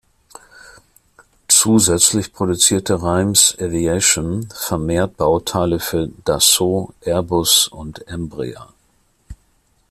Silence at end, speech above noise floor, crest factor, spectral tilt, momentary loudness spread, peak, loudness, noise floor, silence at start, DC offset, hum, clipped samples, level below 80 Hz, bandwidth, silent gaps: 0.55 s; 42 dB; 18 dB; -3 dB/octave; 14 LU; 0 dBFS; -15 LUFS; -60 dBFS; 1.5 s; under 0.1%; none; under 0.1%; -44 dBFS; 16 kHz; none